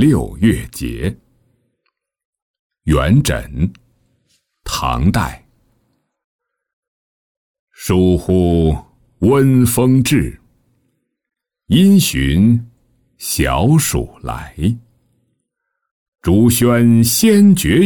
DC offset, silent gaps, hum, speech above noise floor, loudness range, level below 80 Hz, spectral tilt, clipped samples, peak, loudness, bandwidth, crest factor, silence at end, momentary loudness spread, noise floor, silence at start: under 0.1%; 2.25-2.33 s, 2.42-2.70 s, 6.24-6.39 s, 6.73-7.67 s, 15.91-16.12 s; none; 62 dB; 8 LU; -32 dBFS; -5.5 dB/octave; under 0.1%; -2 dBFS; -14 LUFS; 19.5 kHz; 14 dB; 0 s; 14 LU; -75 dBFS; 0 s